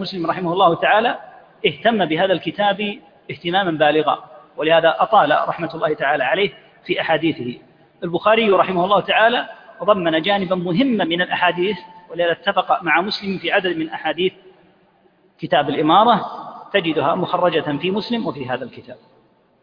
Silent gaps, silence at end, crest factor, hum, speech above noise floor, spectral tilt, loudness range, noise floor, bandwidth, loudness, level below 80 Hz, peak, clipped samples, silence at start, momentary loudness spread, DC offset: none; 0.7 s; 18 dB; none; 38 dB; -7.5 dB/octave; 3 LU; -56 dBFS; 5.2 kHz; -18 LUFS; -62 dBFS; -2 dBFS; under 0.1%; 0 s; 12 LU; under 0.1%